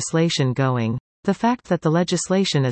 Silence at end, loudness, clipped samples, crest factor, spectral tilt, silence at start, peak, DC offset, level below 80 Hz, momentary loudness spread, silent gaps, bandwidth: 0 s; -21 LUFS; under 0.1%; 14 dB; -5.5 dB/octave; 0 s; -6 dBFS; under 0.1%; -58 dBFS; 6 LU; 1.00-1.23 s; 8.8 kHz